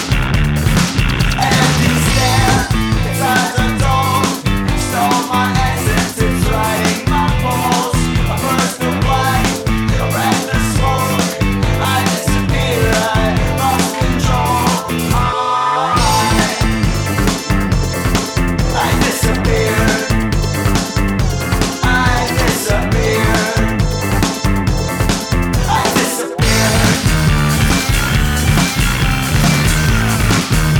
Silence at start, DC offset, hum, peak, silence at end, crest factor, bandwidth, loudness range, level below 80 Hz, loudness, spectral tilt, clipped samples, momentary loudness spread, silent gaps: 0 s; under 0.1%; none; 0 dBFS; 0 s; 12 dB; 19.5 kHz; 2 LU; -22 dBFS; -14 LUFS; -4.5 dB/octave; under 0.1%; 4 LU; none